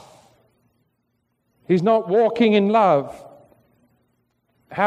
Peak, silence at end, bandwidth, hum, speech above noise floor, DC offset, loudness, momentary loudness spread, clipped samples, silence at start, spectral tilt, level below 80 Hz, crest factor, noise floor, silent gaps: -4 dBFS; 0 s; 9.2 kHz; none; 54 dB; under 0.1%; -18 LUFS; 18 LU; under 0.1%; 1.7 s; -7.5 dB/octave; -66 dBFS; 18 dB; -71 dBFS; none